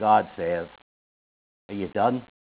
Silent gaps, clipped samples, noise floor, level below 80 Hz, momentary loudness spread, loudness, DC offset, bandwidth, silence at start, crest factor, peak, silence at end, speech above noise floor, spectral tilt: 0.82-1.69 s; under 0.1%; under -90 dBFS; -60 dBFS; 15 LU; -26 LUFS; under 0.1%; 4 kHz; 0 s; 20 dB; -8 dBFS; 0.3 s; over 66 dB; -10 dB/octave